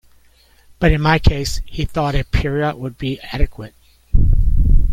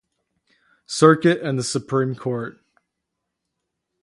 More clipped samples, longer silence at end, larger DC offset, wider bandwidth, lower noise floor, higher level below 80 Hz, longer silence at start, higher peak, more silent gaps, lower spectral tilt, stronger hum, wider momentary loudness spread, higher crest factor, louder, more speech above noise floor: neither; second, 0 s vs 1.5 s; neither; about the same, 12.5 kHz vs 11.5 kHz; second, -51 dBFS vs -80 dBFS; first, -18 dBFS vs -66 dBFS; about the same, 0.8 s vs 0.9 s; about the same, 0 dBFS vs 0 dBFS; neither; about the same, -6 dB/octave vs -5.5 dB/octave; neither; second, 10 LU vs 15 LU; second, 16 dB vs 22 dB; about the same, -19 LUFS vs -20 LUFS; second, 34 dB vs 61 dB